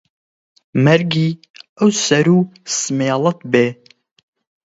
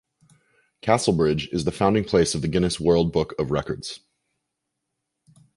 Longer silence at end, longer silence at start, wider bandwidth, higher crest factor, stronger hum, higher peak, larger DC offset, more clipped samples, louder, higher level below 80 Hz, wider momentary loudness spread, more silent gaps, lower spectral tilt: second, 0.95 s vs 1.6 s; about the same, 0.75 s vs 0.85 s; second, 8 kHz vs 11.5 kHz; about the same, 18 dB vs 20 dB; neither; first, 0 dBFS vs -4 dBFS; neither; neither; first, -16 LUFS vs -23 LUFS; second, -60 dBFS vs -44 dBFS; second, 8 LU vs 12 LU; first, 1.50-1.54 s, 1.69-1.76 s vs none; about the same, -5 dB/octave vs -5.5 dB/octave